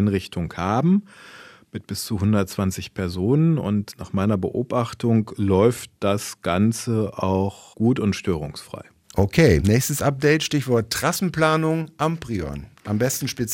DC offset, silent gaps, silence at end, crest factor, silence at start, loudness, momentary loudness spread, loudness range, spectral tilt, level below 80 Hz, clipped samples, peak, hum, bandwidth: under 0.1%; none; 0 s; 18 dB; 0 s; -22 LUFS; 10 LU; 4 LU; -6 dB/octave; -46 dBFS; under 0.1%; -4 dBFS; none; 16.5 kHz